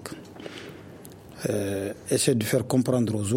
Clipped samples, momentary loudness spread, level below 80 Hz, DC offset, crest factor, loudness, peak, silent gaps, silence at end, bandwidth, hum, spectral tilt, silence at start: under 0.1%; 21 LU; -60 dBFS; under 0.1%; 18 dB; -25 LUFS; -8 dBFS; none; 0 s; 16.5 kHz; none; -5 dB/octave; 0 s